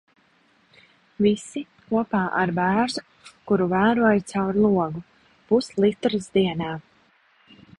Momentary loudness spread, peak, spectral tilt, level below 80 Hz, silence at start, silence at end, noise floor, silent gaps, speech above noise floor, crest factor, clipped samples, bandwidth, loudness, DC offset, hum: 11 LU; -6 dBFS; -6.5 dB/octave; -56 dBFS; 1.2 s; 1 s; -61 dBFS; none; 39 dB; 18 dB; under 0.1%; 11 kHz; -23 LUFS; under 0.1%; none